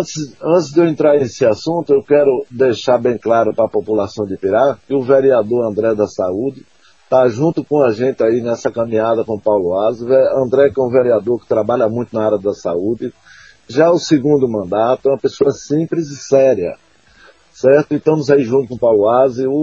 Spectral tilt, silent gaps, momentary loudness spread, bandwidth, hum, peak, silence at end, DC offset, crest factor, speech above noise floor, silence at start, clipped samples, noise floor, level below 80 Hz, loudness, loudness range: -6.5 dB/octave; none; 7 LU; 7.6 kHz; none; 0 dBFS; 0 s; 0.2%; 14 dB; 33 dB; 0 s; under 0.1%; -47 dBFS; -56 dBFS; -15 LUFS; 2 LU